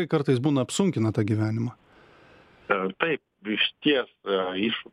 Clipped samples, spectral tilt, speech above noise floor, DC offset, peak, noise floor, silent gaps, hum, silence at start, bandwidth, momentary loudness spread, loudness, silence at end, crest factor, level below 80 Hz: under 0.1%; -5.5 dB/octave; 29 dB; under 0.1%; -4 dBFS; -54 dBFS; none; none; 0 s; 12 kHz; 8 LU; -26 LUFS; 0.1 s; 22 dB; -66 dBFS